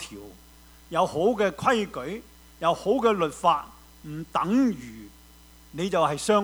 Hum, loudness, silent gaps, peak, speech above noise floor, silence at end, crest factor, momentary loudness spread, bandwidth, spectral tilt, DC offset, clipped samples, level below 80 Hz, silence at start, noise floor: none; -25 LUFS; none; -8 dBFS; 27 dB; 0 s; 18 dB; 19 LU; over 20 kHz; -5 dB/octave; under 0.1%; under 0.1%; -54 dBFS; 0 s; -52 dBFS